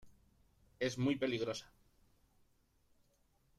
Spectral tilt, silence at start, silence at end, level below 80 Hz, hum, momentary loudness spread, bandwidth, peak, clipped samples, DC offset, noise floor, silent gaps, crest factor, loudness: -5.5 dB/octave; 0.05 s; 1.95 s; -72 dBFS; none; 7 LU; 13.5 kHz; -24 dBFS; under 0.1%; under 0.1%; -75 dBFS; none; 20 dB; -38 LUFS